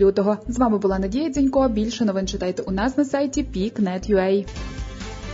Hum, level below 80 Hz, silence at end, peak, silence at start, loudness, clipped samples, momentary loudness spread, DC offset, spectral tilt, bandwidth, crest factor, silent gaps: none; -36 dBFS; 0 s; -6 dBFS; 0 s; -22 LUFS; under 0.1%; 13 LU; under 0.1%; -6 dB/octave; 7.8 kHz; 14 dB; none